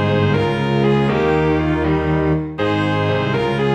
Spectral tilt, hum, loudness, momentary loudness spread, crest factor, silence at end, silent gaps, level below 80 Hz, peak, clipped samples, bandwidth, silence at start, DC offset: -8 dB/octave; none; -17 LUFS; 3 LU; 12 dB; 0 s; none; -34 dBFS; -4 dBFS; under 0.1%; 8.8 kHz; 0 s; under 0.1%